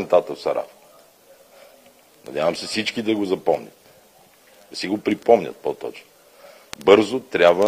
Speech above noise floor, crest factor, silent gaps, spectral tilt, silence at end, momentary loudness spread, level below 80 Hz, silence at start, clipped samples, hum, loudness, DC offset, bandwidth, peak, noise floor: 33 dB; 22 dB; none; -4.5 dB/octave; 0 s; 17 LU; -64 dBFS; 0 s; under 0.1%; none; -21 LUFS; under 0.1%; 16 kHz; 0 dBFS; -53 dBFS